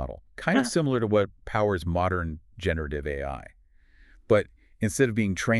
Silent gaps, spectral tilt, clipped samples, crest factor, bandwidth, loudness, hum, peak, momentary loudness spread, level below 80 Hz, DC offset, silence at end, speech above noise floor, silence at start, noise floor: none; -6 dB/octave; under 0.1%; 18 dB; 13.5 kHz; -27 LUFS; none; -8 dBFS; 11 LU; -44 dBFS; under 0.1%; 0 s; 30 dB; 0 s; -56 dBFS